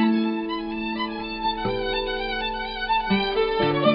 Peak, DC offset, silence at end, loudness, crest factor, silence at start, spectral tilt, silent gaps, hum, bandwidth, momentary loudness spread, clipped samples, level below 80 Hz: -6 dBFS; under 0.1%; 0 s; -25 LUFS; 18 dB; 0 s; -3 dB/octave; none; none; 5.6 kHz; 6 LU; under 0.1%; -42 dBFS